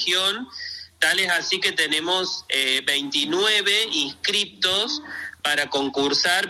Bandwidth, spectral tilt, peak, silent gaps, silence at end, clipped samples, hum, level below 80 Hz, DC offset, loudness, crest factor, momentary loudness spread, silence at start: 16 kHz; -1 dB/octave; -6 dBFS; none; 0 s; under 0.1%; none; -66 dBFS; under 0.1%; -21 LUFS; 18 dB; 8 LU; 0 s